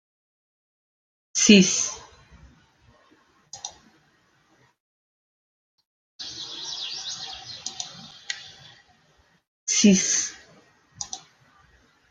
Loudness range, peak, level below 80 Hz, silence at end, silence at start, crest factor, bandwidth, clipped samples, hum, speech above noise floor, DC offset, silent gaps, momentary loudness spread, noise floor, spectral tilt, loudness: 23 LU; -2 dBFS; -64 dBFS; 0.95 s; 1.35 s; 26 dB; 9.8 kHz; under 0.1%; none; 45 dB; under 0.1%; 4.80-5.78 s, 5.85-6.19 s, 9.48-9.66 s; 23 LU; -63 dBFS; -3 dB/octave; -23 LUFS